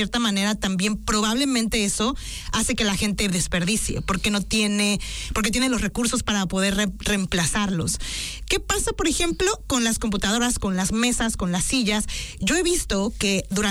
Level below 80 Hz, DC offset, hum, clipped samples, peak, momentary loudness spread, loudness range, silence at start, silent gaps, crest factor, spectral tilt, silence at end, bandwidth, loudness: -36 dBFS; under 0.1%; none; under 0.1%; -10 dBFS; 4 LU; 1 LU; 0 s; none; 12 dB; -3.5 dB/octave; 0 s; 19.5 kHz; -22 LUFS